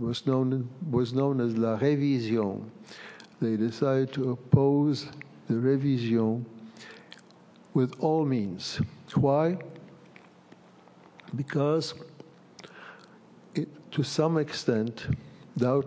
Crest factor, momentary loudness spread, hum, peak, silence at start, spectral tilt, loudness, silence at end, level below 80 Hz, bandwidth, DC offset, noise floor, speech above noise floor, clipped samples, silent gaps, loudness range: 22 dB; 21 LU; none; -6 dBFS; 0 s; -7.5 dB/octave; -28 LUFS; 0 s; -58 dBFS; 8 kHz; under 0.1%; -55 dBFS; 28 dB; under 0.1%; none; 7 LU